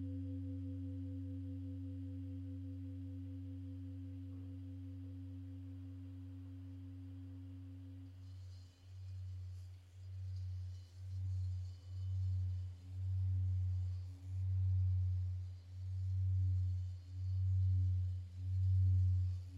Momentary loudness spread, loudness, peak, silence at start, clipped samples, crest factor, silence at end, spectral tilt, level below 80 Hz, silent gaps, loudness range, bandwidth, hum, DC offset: 15 LU; -42 LUFS; -28 dBFS; 0 s; under 0.1%; 12 dB; 0 s; -9.5 dB/octave; -60 dBFS; none; 13 LU; 5 kHz; none; under 0.1%